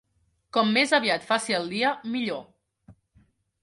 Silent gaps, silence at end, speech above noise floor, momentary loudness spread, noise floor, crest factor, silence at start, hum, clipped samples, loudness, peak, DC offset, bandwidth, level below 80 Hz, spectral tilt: none; 0.7 s; 45 dB; 9 LU; -70 dBFS; 20 dB; 0.55 s; none; under 0.1%; -24 LUFS; -8 dBFS; under 0.1%; 11.5 kHz; -68 dBFS; -3.5 dB/octave